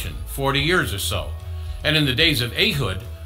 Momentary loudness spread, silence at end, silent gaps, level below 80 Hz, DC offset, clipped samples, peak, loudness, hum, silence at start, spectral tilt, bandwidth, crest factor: 13 LU; 0 s; none; -34 dBFS; under 0.1%; under 0.1%; -2 dBFS; -20 LUFS; none; 0 s; -4 dB/octave; 16.5 kHz; 20 dB